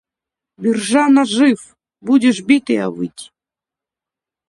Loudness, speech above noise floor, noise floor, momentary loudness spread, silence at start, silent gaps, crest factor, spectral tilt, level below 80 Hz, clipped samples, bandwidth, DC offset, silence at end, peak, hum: -15 LUFS; 73 dB; -88 dBFS; 14 LU; 0.6 s; none; 16 dB; -4.5 dB/octave; -64 dBFS; under 0.1%; 11.5 kHz; under 0.1%; 1.25 s; 0 dBFS; none